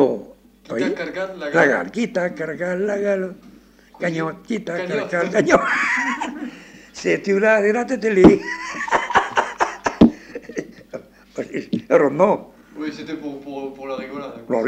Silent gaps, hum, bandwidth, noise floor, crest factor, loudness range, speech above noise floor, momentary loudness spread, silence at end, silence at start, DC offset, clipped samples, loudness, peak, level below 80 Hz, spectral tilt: none; none; 9.8 kHz; -48 dBFS; 20 dB; 5 LU; 28 dB; 16 LU; 0 s; 0 s; under 0.1%; under 0.1%; -20 LUFS; -2 dBFS; -48 dBFS; -5.5 dB/octave